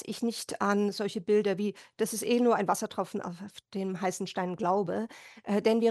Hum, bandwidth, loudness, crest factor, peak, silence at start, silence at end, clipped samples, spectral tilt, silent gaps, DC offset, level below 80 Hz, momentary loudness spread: none; 13 kHz; -30 LUFS; 18 dB; -12 dBFS; 0 s; 0 s; under 0.1%; -5 dB/octave; none; under 0.1%; -76 dBFS; 11 LU